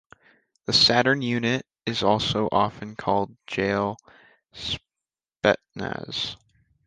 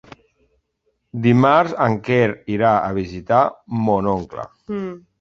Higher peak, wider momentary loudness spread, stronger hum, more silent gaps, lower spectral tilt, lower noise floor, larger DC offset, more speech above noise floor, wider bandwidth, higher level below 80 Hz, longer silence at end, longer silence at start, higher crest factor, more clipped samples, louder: about the same, -4 dBFS vs -2 dBFS; about the same, 15 LU vs 14 LU; neither; neither; second, -4.5 dB/octave vs -8 dB/octave; first, -90 dBFS vs -70 dBFS; neither; first, 65 dB vs 51 dB; first, 9.8 kHz vs 7.2 kHz; about the same, -54 dBFS vs -50 dBFS; first, 0.5 s vs 0.2 s; second, 0.7 s vs 1.15 s; about the same, 22 dB vs 18 dB; neither; second, -24 LUFS vs -18 LUFS